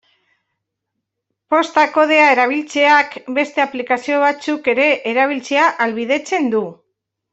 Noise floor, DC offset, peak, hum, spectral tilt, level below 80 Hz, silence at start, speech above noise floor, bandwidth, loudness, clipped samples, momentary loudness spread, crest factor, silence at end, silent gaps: -77 dBFS; under 0.1%; -2 dBFS; none; -3.5 dB/octave; -68 dBFS; 1.5 s; 62 dB; 8.2 kHz; -15 LUFS; under 0.1%; 8 LU; 16 dB; 0.6 s; none